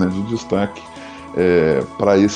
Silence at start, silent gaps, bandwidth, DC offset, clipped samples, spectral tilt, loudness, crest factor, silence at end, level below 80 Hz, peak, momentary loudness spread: 0 s; none; 10 kHz; under 0.1%; under 0.1%; -6.5 dB/octave; -18 LUFS; 16 dB; 0 s; -46 dBFS; -2 dBFS; 19 LU